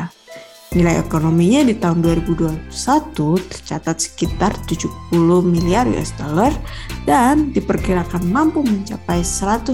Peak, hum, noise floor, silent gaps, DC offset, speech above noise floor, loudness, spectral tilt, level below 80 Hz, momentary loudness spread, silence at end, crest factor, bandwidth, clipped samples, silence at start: -4 dBFS; none; -39 dBFS; none; 0.6%; 22 dB; -17 LUFS; -6 dB/octave; -32 dBFS; 10 LU; 0 s; 14 dB; 16 kHz; under 0.1%; 0 s